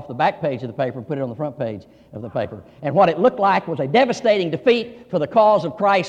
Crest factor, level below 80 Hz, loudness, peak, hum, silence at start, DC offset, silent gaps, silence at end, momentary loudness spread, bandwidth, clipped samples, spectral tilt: 16 dB; -60 dBFS; -20 LUFS; -4 dBFS; none; 0 s; under 0.1%; none; 0 s; 13 LU; 8.8 kHz; under 0.1%; -6.5 dB/octave